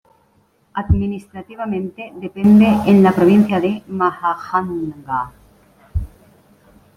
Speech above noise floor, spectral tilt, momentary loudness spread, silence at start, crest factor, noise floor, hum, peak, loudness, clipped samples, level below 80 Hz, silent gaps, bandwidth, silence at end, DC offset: 43 dB; -8.5 dB/octave; 19 LU; 0.75 s; 14 dB; -58 dBFS; none; -2 dBFS; -16 LUFS; under 0.1%; -36 dBFS; none; 9.8 kHz; 0.9 s; under 0.1%